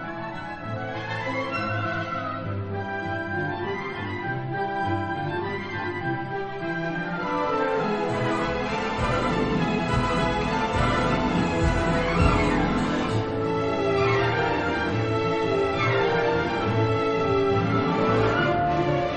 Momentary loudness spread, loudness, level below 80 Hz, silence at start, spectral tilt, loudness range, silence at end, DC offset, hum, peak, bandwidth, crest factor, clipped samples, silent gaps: 8 LU; -25 LUFS; -40 dBFS; 0 s; -6.5 dB/octave; 6 LU; 0 s; under 0.1%; none; -8 dBFS; 9.4 kHz; 18 dB; under 0.1%; none